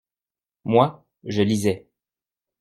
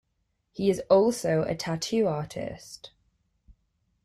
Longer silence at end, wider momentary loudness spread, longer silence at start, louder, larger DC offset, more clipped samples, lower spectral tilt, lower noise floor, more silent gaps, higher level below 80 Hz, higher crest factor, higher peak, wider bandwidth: second, 0.8 s vs 1.15 s; second, 15 LU vs 21 LU; about the same, 0.65 s vs 0.55 s; first, -22 LUFS vs -26 LUFS; neither; neither; about the same, -6.5 dB/octave vs -5.5 dB/octave; first, under -90 dBFS vs -76 dBFS; neither; about the same, -62 dBFS vs -58 dBFS; about the same, 22 dB vs 20 dB; first, -2 dBFS vs -8 dBFS; about the same, 15 kHz vs 14 kHz